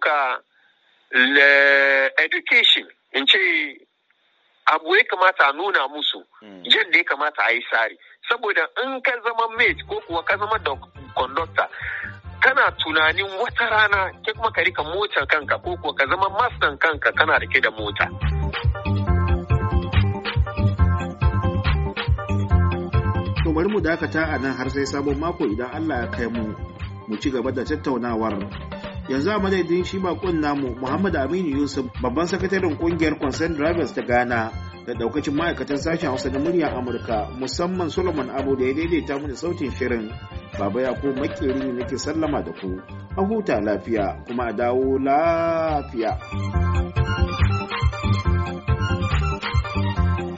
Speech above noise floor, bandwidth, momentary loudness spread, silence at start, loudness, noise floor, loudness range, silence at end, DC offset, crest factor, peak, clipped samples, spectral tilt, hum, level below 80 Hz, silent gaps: 43 dB; 8 kHz; 10 LU; 0 s; -21 LUFS; -65 dBFS; 7 LU; 0 s; under 0.1%; 22 dB; 0 dBFS; under 0.1%; -3.5 dB/octave; none; -34 dBFS; none